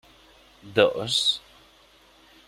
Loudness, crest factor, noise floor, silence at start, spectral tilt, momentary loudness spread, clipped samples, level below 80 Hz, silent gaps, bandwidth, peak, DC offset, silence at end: -23 LUFS; 24 dB; -56 dBFS; 0.65 s; -3 dB/octave; 7 LU; under 0.1%; -62 dBFS; none; 15.5 kHz; -4 dBFS; under 0.1%; 1.1 s